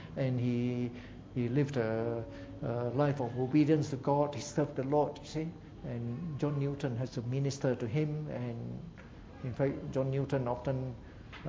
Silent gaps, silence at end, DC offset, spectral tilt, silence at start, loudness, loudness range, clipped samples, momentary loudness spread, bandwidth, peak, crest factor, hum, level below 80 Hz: none; 0 s; under 0.1%; -7.5 dB/octave; 0 s; -34 LUFS; 4 LU; under 0.1%; 12 LU; 7.8 kHz; -16 dBFS; 18 dB; none; -56 dBFS